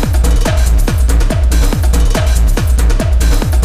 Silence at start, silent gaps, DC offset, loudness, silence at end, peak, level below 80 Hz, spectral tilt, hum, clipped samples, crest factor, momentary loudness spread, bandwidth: 0 s; none; under 0.1%; -13 LUFS; 0 s; 0 dBFS; -10 dBFS; -5.5 dB/octave; none; under 0.1%; 10 dB; 0 LU; 15.5 kHz